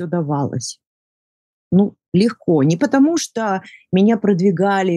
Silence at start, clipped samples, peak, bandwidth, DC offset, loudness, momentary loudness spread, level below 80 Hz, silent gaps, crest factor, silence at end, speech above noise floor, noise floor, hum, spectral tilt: 0 s; under 0.1%; -2 dBFS; 12.5 kHz; under 0.1%; -17 LUFS; 8 LU; -62 dBFS; 0.87-1.71 s, 2.08-2.12 s; 14 dB; 0 s; over 74 dB; under -90 dBFS; none; -6.5 dB/octave